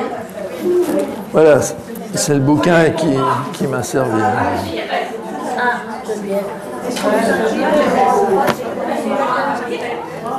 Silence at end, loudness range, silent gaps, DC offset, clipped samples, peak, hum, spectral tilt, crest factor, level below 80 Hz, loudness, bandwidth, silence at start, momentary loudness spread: 0 s; 4 LU; none; under 0.1%; under 0.1%; 0 dBFS; none; -5 dB/octave; 16 dB; -52 dBFS; -16 LUFS; 13.5 kHz; 0 s; 12 LU